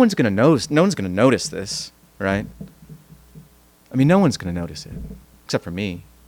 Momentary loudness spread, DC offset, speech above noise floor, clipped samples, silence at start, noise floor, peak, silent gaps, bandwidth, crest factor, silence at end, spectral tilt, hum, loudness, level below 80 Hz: 20 LU; under 0.1%; 32 dB; under 0.1%; 0 s; -52 dBFS; -4 dBFS; none; 19 kHz; 18 dB; 0.3 s; -6 dB/octave; none; -20 LUFS; -46 dBFS